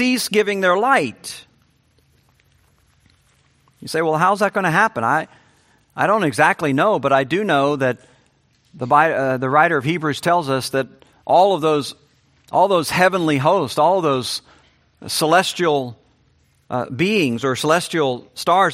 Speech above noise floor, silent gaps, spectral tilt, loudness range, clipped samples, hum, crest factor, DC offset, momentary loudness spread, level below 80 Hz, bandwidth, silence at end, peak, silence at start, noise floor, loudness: 42 dB; none; -4.5 dB/octave; 4 LU; under 0.1%; none; 18 dB; under 0.1%; 12 LU; -62 dBFS; 16 kHz; 0 s; 0 dBFS; 0 s; -59 dBFS; -18 LUFS